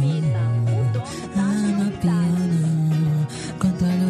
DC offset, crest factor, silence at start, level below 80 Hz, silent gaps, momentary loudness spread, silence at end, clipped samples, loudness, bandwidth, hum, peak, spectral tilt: under 0.1%; 12 dB; 0 s; -48 dBFS; none; 4 LU; 0 s; under 0.1%; -22 LUFS; 12.5 kHz; none; -8 dBFS; -7.5 dB/octave